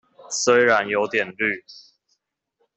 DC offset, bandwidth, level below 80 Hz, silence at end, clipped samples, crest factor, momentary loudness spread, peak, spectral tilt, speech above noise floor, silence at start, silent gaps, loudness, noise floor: under 0.1%; 8.2 kHz; -70 dBFS; 1.05 s; under 0.1%; 20 dB; 10 LU; -4 dBFS; -2.5 dB/octave; 52 dB; 0.3 s; none; -20 LUFS; -72 dBFS